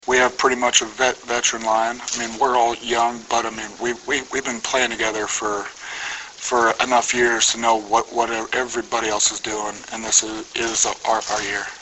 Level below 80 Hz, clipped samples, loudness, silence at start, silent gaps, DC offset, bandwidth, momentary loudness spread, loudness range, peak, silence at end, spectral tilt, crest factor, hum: -54 dBFS; under 0.1%; -20 LUFS; 0.05 s; none; under 0.1%; 8.4 kHz; 10 LU; 3 LU; 0 dBFS; 0 s; -0.5 dB/octave; 20 dB; none